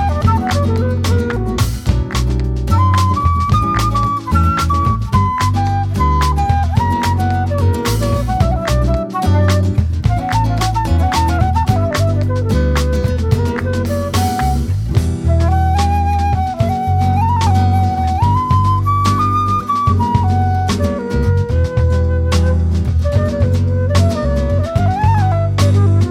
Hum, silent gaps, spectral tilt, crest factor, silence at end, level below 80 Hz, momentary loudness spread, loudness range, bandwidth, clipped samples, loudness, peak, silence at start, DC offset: none; none; -6.5 dB/octave; 14 dB; 0 s; -22 dBFS; 4 LU; 1 LU; 15 kHz; under 0.1%; -15 LUFS; 0 dBFS; 0 s; under 0.1%